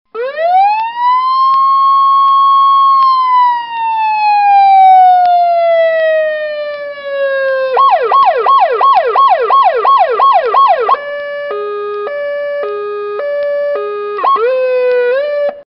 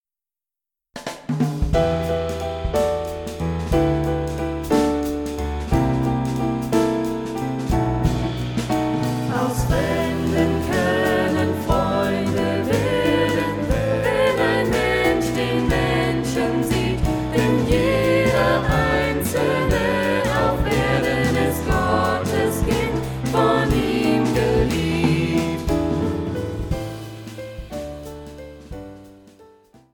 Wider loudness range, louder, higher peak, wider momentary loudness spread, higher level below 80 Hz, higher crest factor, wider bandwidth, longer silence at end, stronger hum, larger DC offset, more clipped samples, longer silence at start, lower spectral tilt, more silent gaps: about the same, 7 LU vs 5 LU; first, -10 LUFS vs -21 LUFS; first, 0 dBFS vs -4 dBFS; first, 12 LU vs 9 LU; second, -62 dBFS vs -32 dBFS; second, 10 dB vs 16 dB; second, 5.6 kHz vs 19 kHz; second, 0.05 s vs 0.5 s; neither; neither; neither; second, 0.15 s vs 0.95 s; second, -3.5 dB/octave vs -6 dB/octave; neither